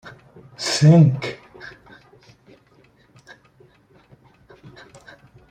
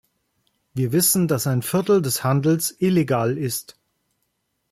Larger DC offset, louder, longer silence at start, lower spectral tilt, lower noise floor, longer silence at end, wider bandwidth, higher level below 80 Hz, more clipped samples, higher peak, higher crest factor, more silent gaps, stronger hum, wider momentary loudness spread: neither; first, -17 LUFS vs -20 LUFS; second, 0.05 s vs 0.75 s; about the same, -6 dB/octave vs -5 dB/octave; second, -56 dBFS vs -73 dBFS; first, 3.85 s vs 1 s; second, 9.6 kHz vs 16 kHz; about the same, -58 dBFS vs -60 dBFS; neither; first, -2 dBFS vs -6 dBFS; about the same, 20 dB vs 16 dB; neither; neither; first, 28 LU vs 9 LU